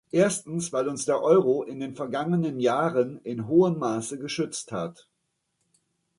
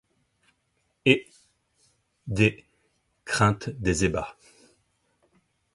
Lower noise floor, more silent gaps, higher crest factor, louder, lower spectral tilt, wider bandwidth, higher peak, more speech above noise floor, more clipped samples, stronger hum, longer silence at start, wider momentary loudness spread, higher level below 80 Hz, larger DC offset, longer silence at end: first, -77 dBFS vs -73 dBFS; neither; second, 18 dB vs 26 dB; about the same, -26 LUFS vs -25 LUFS; about the same, -5.5 dB/octave vs -5 dB/octave; about the same, 11.5 kHz vs 11.5 kHz; second, -8 dBFS vs -2 dBFS; about the same, 52 dB vs 49 dB; neither; neither; second, 0.15 s vs 1.05 s; second, 12 LU vs 15 LU; second, -68 dBFS vs -48 dBFS; neither; second, 1.25 s vs 1.45 s